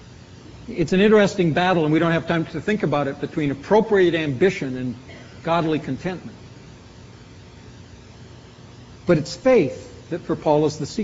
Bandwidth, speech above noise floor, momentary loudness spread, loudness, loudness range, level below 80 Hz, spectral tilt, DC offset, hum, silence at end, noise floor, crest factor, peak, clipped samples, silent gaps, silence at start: 8 kHz; 23 dB; 16 LU; -21 LUFS; 10 LU; -50 dBFS; -5.5 dB/octave; under 0.1%; none; 0 s; -43 dBFS; 18 dB; -4 dBFS; under 0.1%; none; 0 s